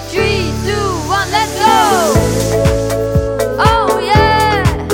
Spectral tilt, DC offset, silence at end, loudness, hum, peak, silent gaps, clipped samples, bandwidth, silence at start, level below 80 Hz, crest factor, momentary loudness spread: -5 dB/octave; under 0.1%; 0 s; -13 LUFS; none; 0 dBFS; none; under 0.1%; 17 kHz; 0 s; -24 dBFS; 12 dB; 6 LU